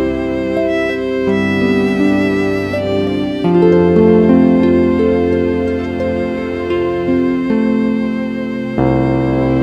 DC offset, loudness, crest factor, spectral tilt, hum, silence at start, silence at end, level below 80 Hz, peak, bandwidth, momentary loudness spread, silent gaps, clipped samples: under 0.1%; -14 LUFS; 14 dB; -8 dB/octave; none; 0 s; 0 s; -36 dBFS; 0 dBFS; 8.4 kHz; 8 LU; none; under 0.1%